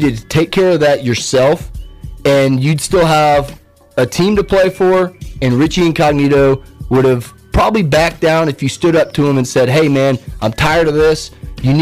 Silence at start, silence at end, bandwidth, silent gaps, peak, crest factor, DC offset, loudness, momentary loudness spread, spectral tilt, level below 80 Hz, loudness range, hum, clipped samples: 0 s; 0 s; 16 kHz; none; -4 dBFS; 8 dB; under 0.1%; -13 LUFS; 9 LU; -6 dB/octave; -30 dBFS; 1 LU; none; under 0.1%